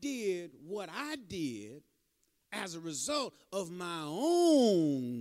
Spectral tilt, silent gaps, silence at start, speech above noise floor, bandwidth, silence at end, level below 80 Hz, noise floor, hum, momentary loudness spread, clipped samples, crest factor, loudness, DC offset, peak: -4.5 dB/octave; none; 0 s; 44 dB; 15.5 kHz; 0 s; -74 dBFS; -77 dBFS; none; 16 LU; under 0.1%; 18 dB; -33 LUFS; under 0.1%; -16 dBFS